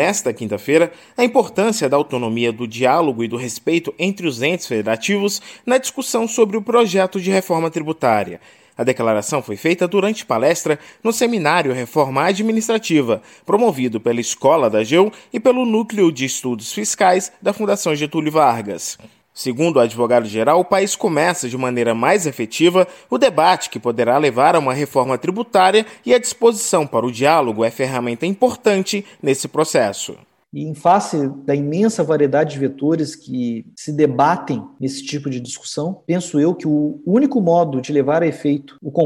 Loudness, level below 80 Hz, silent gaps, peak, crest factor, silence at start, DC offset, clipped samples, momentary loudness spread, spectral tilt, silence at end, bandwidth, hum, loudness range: -17 LUFS; -66 dBFS; none; -2 dBFS; 16 dB; 0 s; under 0.1%; under 0.1%; 9 LU; -4.5 dB/octave; 0 s; 17 kHz; none; 3 LU